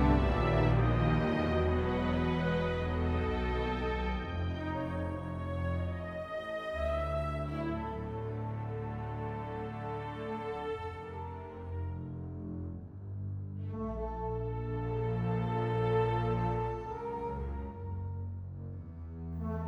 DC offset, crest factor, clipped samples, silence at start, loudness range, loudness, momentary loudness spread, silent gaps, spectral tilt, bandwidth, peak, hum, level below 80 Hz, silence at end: under 0.1%; 18 dB; under 0.1%; 0 s; 9 LU; -35 LUFS; 12 LU; none; -8.5 dB/octave; 7.2 kHz; -16 dBFS; none; -42 dBFS; 0 s